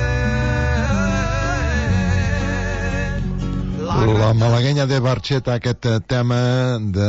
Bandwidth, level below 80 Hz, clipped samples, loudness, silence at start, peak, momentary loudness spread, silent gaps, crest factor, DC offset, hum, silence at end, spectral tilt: 8 kHz; -28 dBFS; under 0.1%; -19 LUFS; 0 s; -6 dBFS; 7 LU; none; 12 dB; under 0.1%; none; 0 s; -6.5 dB/octave